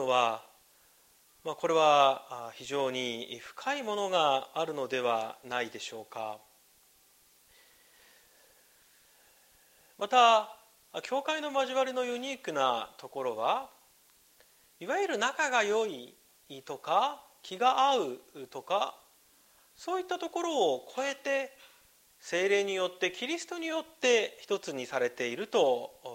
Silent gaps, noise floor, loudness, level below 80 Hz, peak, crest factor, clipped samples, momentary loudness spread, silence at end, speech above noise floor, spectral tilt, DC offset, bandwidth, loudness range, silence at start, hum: none; -64 dBFS; -30 LUFS; -80 dBFS; -10 dBFS; 22 dB; under 0.1%; 16 LU; 0 s; 33 dB; -2.5 dB/octave; under 0.1%; 16 kHz; 5 LU; 0 s; none